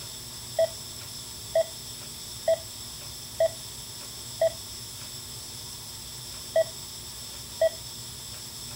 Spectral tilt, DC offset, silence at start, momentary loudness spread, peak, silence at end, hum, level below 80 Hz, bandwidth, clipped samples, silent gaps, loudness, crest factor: -2 dB/octave; under 0.1%; 0 s; 9 LU; -14 dBFS; 0 s; none; -56 dBFS; 16 kHz; under 0.1%; none; -32 LUFS; 18 dB